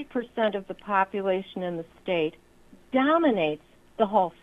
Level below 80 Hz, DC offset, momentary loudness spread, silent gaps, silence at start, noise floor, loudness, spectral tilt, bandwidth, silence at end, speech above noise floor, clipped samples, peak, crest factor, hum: -62 dBFS; under 0.1%; 12 LU; none; 0 s; -50 dBFS; -27 LUFS; -7.5 dB/octave; 11 kHz; 0.1 s; 24 dB; under 0.1%; -8 dBFS; 18 dB; none